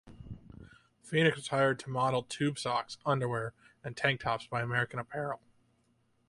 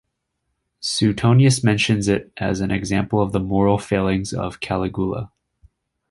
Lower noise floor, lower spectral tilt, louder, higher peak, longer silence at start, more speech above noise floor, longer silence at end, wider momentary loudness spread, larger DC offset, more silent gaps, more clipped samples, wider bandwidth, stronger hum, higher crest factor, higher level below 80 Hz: about the same, -72 dBFS vs -75 dBFS; about the same, -5.5 dB/octave vs -5.5 dB/octave; second, -32 LUFS vs -20 LUFS; second, -12 dBFS vs -2 dBFS; second, 0.05 s vs 0.8 s; second, 40 dB vs 56 dB; about the same, 0.95 s vs 0.85 s; first, 16 LU vs 10 LU; neither; neither; neither; about the same, 11.5 kHz vs 11.5 kHz; neither; about the same, 22 dB vs 18 dB; second, -64 dBFS vs -42 dBFS